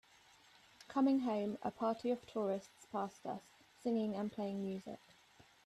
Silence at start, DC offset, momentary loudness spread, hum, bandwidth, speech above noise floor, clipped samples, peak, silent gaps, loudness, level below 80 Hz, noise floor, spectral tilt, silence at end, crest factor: 0.8 s; under 0.1%; 13 LU; none; 13 kHz; 28 dB; under 0.1%; -24 dBFS; none; -40 LUFS; -80 dBFS; -66 dBFS; -7 dB/octave; 0.7 s; 16 dB